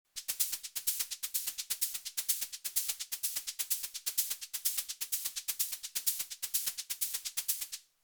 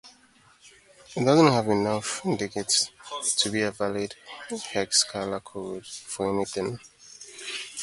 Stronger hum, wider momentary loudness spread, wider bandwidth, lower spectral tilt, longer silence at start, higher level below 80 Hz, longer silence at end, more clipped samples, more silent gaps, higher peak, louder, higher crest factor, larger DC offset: neither; second, 3 LU vs 16 LU; first, over 20 kHz vs 11.5 kHz; second, 4 dB/octave vs -3.5 dB/octave; about the same, 0.15 s vs 0.05 s; second, -78 dBFS vs -62 dBFS; first, 0.25 s vs 0 s; neither; neither; second, -16 dBFS vs -4 dBFS; second, -34 LUFS vs -26 LUFS; about the same, 22 dB vs 24 dB; neither